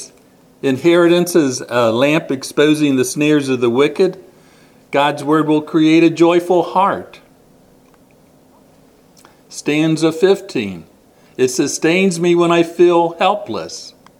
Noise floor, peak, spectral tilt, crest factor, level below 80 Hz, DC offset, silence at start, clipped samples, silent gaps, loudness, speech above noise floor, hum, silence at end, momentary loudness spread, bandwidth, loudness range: -49 dBFS; 0 dBFS; -5 dB/octave; 16 dB; -62 dBFS; under 0.1%; 0 s; under 0.1%; none; -15 LUFS; 35 dB; none; 0.3 s; 12 LU; 15 kHz; 6 LU